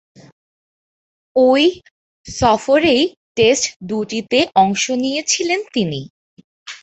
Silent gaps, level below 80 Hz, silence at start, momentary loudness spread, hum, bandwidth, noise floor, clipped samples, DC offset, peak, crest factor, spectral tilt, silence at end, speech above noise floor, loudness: 1.91-2.24 s, 3.17-3.35 s, 3.76-3.80 s, 6.10-6.37 s, 6.44-6.66 s; -48 dBFS; 1.35 s; 9 LU; none; 8.2 kHz; under -90 dBFS; under 0.1%; under 0.1%; 0 dBFS; 18 dB; -3.5 dB/octave; 0.05 s; over 74 dB; -16 LUFS